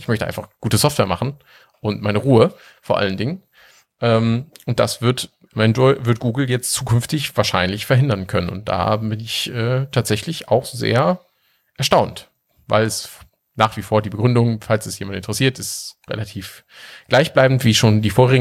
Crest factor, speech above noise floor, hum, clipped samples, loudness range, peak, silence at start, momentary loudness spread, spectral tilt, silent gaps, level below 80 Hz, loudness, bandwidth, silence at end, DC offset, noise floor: 18 dB; 45 dB; none; under 0.1%; 2 LU; 0 dBFS; 0 s; 13 LU; -5 dB/octave; none; -48 dBFS; -19 LUFS; 15.5 kHz; 0 s; under 0.1%; -63 dBFS